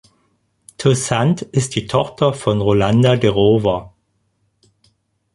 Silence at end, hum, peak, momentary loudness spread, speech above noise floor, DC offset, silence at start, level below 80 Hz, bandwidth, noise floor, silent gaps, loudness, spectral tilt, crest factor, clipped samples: 1.45 s; none; 0 dBFS; 6 LU; 50 dB; under 0.1%; 0.8 s; -44 dBFS; 11.5 kHz; -65 dBFS; none; -16 LUFS; -6 dB/octave; 18 dB; under 0.1%